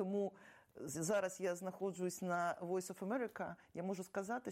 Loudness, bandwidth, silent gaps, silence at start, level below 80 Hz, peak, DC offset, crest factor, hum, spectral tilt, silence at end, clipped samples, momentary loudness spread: -42 LUFS; 16 kHz; none; 0 s; -82 dBFS; -28 dBFS; under 0.1%; 14 dB; none; -5 dB/octave; 0 s; under 0.1%; 9 LU